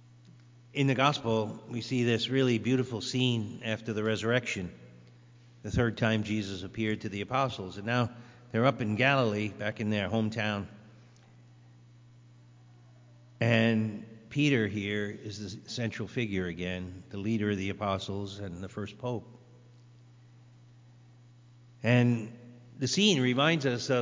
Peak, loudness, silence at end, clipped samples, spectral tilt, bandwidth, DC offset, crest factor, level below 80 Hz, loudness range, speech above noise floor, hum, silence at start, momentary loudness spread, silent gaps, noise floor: -10 dBFS; -30 LUFS; 0 s; under 0.1%; -5.5 dB/octave; 7.6 kHz; under 0.1%; 22 dB; -58 dBFS; 7 LU; 27 dB; 60 Hz at -55 dBFS; 0.75 s; 14 LU; none; -56 dBFS